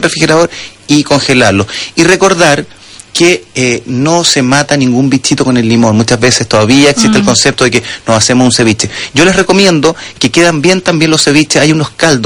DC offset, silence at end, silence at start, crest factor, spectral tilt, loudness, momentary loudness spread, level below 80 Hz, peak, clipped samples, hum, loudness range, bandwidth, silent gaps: under 0.1%; 0 s; 0 s; 8 dB; -4 dB/octave; -8 LUFS; 6 LU; -38 dBFS; 0 dBFS; 1%; none; 2 LU; over 20 kHz; none